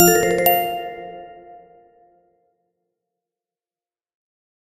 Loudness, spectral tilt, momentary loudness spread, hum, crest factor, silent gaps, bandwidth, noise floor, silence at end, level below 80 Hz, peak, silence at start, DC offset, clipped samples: -17 LUFS; -3.5 dB/octave; 24 LU; none; 24 dB; none; 14.5 kHz; under -90 dBFS; 3.1 s; -54 dBFS; 0 dBFS; 0 s; under 0.1%; under 0.1%